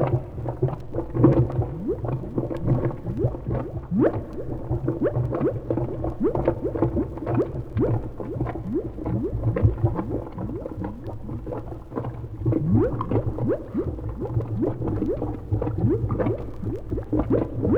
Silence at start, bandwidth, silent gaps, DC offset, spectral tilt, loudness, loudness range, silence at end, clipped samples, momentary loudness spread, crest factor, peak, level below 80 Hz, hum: 0 s; 3.9 kHz; none; under 0.1%; -11.5 dB/octave; -26 LUFS; 3 LU; 0 s; under 0.1%; 10 LU; 22 dB; -4 dBFS; -36 dBFS; none